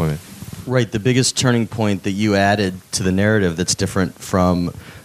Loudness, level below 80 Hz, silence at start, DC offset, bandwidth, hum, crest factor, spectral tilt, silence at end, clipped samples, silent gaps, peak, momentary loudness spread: -18 LUFS; -48 dBFS; 0 s; under 0.1%; 16 kHz; none; 16 dB; -5 dB/octave; 0.05 s; under 0.1%; none; -2 dBFS; 7 LU